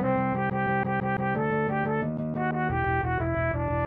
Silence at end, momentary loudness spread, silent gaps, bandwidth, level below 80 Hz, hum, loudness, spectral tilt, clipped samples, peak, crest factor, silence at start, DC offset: 0 s; 2 LU; none; 4.2 kHz; -44 dBFS; none; -27 LUFS; -11 dB/octave; under 0.1%; -16 dBFS; 12 dB; 0 s; under 0.1%